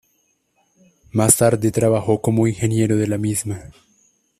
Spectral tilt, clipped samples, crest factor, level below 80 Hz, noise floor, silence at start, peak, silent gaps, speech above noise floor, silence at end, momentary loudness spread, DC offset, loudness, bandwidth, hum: -5.5 dB/octave; under 0.1%; 20 dB; -50 dBFS; -65 dBFS; 1.15 s; 0 dBFS; none; 48 dB; 0.7 s; 11 LU; under 0.1%; -18 LUFS; 15 kHz; none